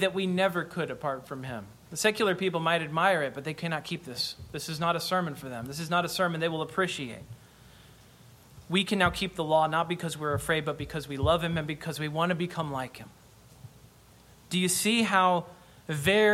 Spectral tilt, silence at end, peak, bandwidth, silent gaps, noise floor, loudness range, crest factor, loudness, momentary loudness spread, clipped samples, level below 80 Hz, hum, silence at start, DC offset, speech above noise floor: -4 dB/octave; 0 s; -8 dBFS; 16.5 kHz; none; -56 dBFS; 4 LU; 20 dB; -29 LUFS; 13 LU; under 0.1%; -54 dBFS; none; 0 s; under 0.1%; 27 dB